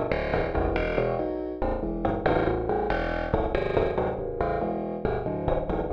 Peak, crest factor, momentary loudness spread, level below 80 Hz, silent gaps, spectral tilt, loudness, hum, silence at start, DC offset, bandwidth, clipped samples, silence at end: -8 dBFS; 18 dB; 4 LU; -36 dBFS; none; -9 dB/octave; -28 LUFS; none; 0 s; under 0.1%; 6.6 kHz; under 0.1%; 0 s